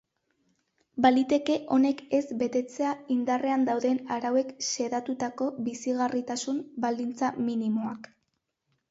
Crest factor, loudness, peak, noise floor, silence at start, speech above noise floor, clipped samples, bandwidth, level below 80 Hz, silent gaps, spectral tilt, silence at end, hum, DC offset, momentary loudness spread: 18 dB; -28 LUFS; -10 dBFS; -79 dBFS; 0.95 s; 52 dB; under 0.1%; 8 kHz; -72 dBFS; none; -4 dB/octave; 0.85 s; none; under 0.1%; 7 LU